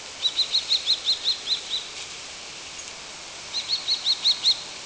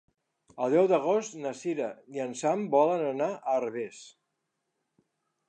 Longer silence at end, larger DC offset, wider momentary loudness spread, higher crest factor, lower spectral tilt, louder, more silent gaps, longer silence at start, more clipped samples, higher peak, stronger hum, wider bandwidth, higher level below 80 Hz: second, 0 s vs 1.4 s; neither; first, 15 LU vs 12 LU; about the same, 16 dB vs 20 dB; second, 1.5 dB/octave vs -5.5 dB/octave; first, -22 LUFS vs -29 LUFS; neither; second, 0 s vs 0.55 s; neither; about the same, -12 dBFS vs -10 dBFS; neither; second, 8 kHz vs 9.6 kHz; first, -62 dBFS vs -84 dBFS